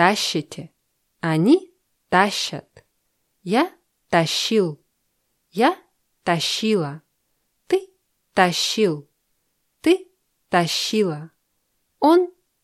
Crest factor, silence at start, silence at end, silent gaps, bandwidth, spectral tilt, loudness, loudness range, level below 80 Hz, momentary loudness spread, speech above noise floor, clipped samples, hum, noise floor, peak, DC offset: 22 dB; 0 s; 0.35 s; none; 14 kHz; -4.5 dB/octave; -21 LUFS; 2 LU; -66 dBFS; 15 LU; 52 dB; under 0.1%; none; -71 dBFS; -2 dBFS; under 0.1%